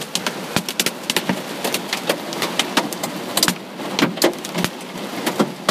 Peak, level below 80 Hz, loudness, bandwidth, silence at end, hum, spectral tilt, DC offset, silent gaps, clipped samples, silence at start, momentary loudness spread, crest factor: 0 dBFS; -60 dBFS; -21 LUFS; 16 kHz; 0 s; none; -2.5 dB/octave; under 0.1%; none; under 0.1%; 0 s; 7 LU; 22 dB